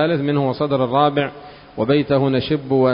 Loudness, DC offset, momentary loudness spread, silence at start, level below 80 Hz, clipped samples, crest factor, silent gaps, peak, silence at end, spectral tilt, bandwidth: -18 LUFS; under 0.1%; 8 LU; 0 s; -50 dBFS; under 0.1%; 16 dB; none; -2 dBFS; 0 s; -12 dB/octave; 5.4 kHz